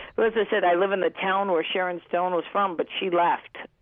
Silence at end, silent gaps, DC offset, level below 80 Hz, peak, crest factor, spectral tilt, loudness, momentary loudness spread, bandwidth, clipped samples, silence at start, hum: 0.15 s; none; under 0.1%; -66 dBFS; -12 dBFS; 12 dB; -8 dB/octave; -24 LUFS; 5 LU; 3.9 kHz; under 0.1%; 0 s; none